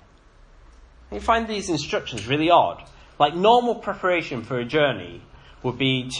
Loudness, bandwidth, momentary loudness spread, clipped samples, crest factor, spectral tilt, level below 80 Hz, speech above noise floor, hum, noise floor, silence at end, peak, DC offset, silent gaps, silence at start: -22 LUFS; 10.5 kHz; 13 LU; under 0.1%; 20 dB; -5 dB/octave; -48 dBFS; 30 dB; none; -52 dBFS; 0 s; -4 dBFS; under 0.1%; none; 1.1 s